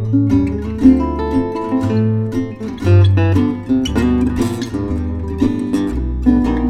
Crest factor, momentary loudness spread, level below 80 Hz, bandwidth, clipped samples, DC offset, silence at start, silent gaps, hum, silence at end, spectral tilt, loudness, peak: 14 dB; 9 LU; -26 dBFS; 10.5 kHz; under 0.1%; 0.1%; 0 s; none; none; 0 s; -8 dB/octave; -16 LUFS; 0 dBFS